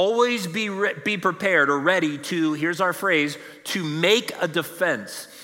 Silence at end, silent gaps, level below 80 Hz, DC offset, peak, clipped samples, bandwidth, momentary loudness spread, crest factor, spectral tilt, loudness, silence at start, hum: 0 s; none; -76 dBFS; under 0.1%; -6 dBFS; under 0.1%; 16.5 kHz; 8 LU; 18 dB; -4 dB/octave; -22 LUFS; 0 s; none